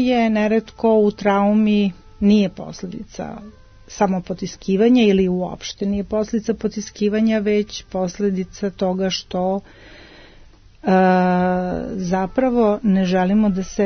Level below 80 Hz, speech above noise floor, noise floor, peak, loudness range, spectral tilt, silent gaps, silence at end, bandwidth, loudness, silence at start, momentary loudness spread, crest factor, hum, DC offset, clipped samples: -44 dBFS; 27 dB; -46 dBFS; -4 dBFS; 4 LU; -6.5 dB/octave; none; 0 s; 6.6 kHz; -19 LUFS; 0 s; 12 LU; 14 dB; none; under 0.1%; under 0.1%